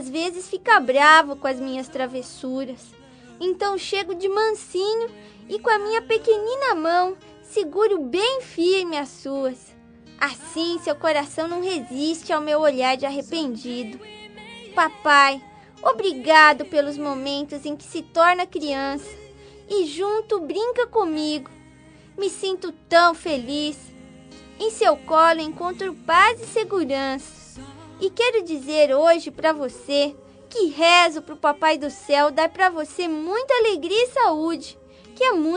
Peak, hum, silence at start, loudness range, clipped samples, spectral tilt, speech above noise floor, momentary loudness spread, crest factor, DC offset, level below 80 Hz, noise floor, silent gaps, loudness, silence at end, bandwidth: 0 dBFS; none; 0 s; 6 LU; under 0.1%; -2.5 dB/octave; 27 dB; 15 LU; 22 dB; under 0.1%; -60 dBFS; -48 dBFS; none; -21 LUFS; 0 s; 10 kHz